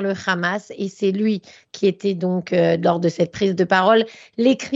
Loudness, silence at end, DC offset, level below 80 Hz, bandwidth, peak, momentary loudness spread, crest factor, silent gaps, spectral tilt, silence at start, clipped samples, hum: -20 LUFS; 0 s; under 0.1%; -62 dBFS; 7.8 kHz; -2 dBFS; 9 LU; 18 dB; none; -6 dB/octave; 0 s; under 0.1%; none